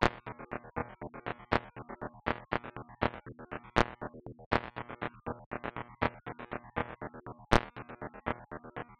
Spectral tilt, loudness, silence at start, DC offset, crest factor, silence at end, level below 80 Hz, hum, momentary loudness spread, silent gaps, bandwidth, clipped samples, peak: -6 dB/octave; -37 LUFS; 0 s; under 0.1%; 28 dB; 0.05 s; -50 dBFS; none; 14 LU; 4.46-4.51 s, 5.46-5.51 s; 9 kHz; under 0.1%; -8 dBFS